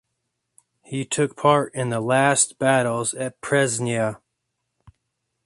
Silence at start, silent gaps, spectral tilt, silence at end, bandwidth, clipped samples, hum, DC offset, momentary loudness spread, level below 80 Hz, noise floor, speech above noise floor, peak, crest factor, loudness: 0.9 s; none; -4 dB/octave; 1.3 s; 11.5 kHz; under 0.1%; none; under 0.1%; 9 LU; -62 dBFS; -78 dBFS; 57 dB; -4 dBFS; 20 dB; -21 LUFS